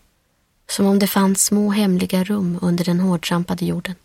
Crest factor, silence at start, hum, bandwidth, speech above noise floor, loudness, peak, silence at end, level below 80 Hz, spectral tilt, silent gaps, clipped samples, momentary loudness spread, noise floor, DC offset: 16 dB; 0.7 s; none; 16.5 kHz; 46 dB; -18 LUFS; -2 dBFS; 0.1 s; -54 dBFS; -5 dB/octave; none; under 0.1%; 7 LU; -64 dBFS; under 0.1%